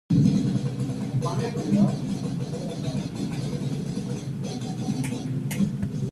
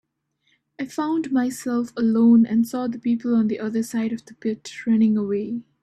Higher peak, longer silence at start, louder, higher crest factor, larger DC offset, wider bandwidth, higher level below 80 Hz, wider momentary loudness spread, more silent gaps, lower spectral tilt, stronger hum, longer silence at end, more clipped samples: about the same, -8 dBFS vs -8 dBFS; second, 0.1 s vs 0.8 s; second, -27 LUFS vs -22 LUFS; about the same, 18 dB vs 14 dB; neither; about the same, 13.5 kHz vs 13 kHz; first, -52 dBFS vs -66 dBFS; second, 9 LU vs 13 LU; neither; about the same, -7 dB/octave vs -6.5 dB/octave; neither; second, 0 s vs 0.2 s; neither